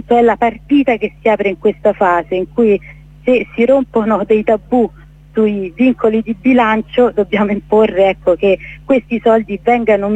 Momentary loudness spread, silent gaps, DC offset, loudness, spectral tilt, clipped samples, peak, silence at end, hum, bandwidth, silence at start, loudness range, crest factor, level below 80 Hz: 4 LU; none; under 0.1%; -14 LUFS; -7.5 dB/octave; under 0.1%; -2 dBFS; 0 s; none; 8 kHz; 0.1 s; 1 LU; 12 dB; -42 dBFS